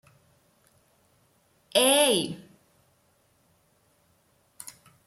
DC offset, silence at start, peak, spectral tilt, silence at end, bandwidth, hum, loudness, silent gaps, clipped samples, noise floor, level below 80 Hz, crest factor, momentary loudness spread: under 0.1%; 1.75 s; -8 dBFS; -1.5 dB/octave; 2.7 s; 16 kHz; none; -22 LUFS; none; under 0.1%; -67 dBFS; -76 dBFS; 24 dB; 25 LU